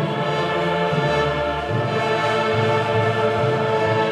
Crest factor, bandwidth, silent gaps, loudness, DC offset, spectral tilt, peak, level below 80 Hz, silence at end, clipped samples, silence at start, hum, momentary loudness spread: 12 dB; 12 kHz; none; -20 LUFS; under 0.1%; -6 dB/octave; -8 dBFS; -44 dBFS; 0 s; under 0.1%; 0 s; none; 3 LU